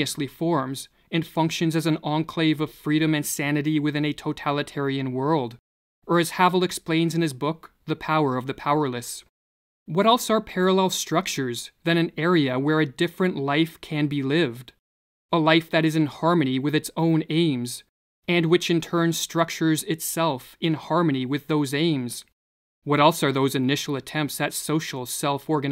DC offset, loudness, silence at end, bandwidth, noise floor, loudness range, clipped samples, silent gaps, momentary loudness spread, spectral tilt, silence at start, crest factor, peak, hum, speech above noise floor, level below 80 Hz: under 0.1%; -24 LUFS; 0 s; 16 kHz; under -90 dBFS; 2 LU; under 0.1%; 5.59-6.02 s, 9.29-9.86 s, 14.79-15.29 s, 17.89-18.23 s, 22.33-22.82 s; 8 LU; -5 dB/octave; 0 s; 20 dB; -4 dBFS; none; over 67 dB; -62 dBFS